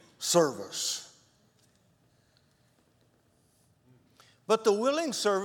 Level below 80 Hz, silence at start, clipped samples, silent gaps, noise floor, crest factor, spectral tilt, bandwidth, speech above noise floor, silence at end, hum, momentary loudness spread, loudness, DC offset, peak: -82 dBFS; 0.2 s; under 0.1%; none; -68 dBFS; 24 dB; -3 dB/octave; 18 kHz; 41 dB; 0 s; none; 12 LU; -28 LUFS; under 0.1%; -10 dBFS